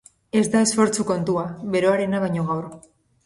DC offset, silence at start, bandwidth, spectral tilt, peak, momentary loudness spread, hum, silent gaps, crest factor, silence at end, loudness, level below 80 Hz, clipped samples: under 0.1%; 0.35 s; 11.5 kHz; -5 dB/octave; -6 dBFS; 8 LU; none; none; 16 dB; 0.45 s; -22 LUFS; -58 dBFS; under 0.1%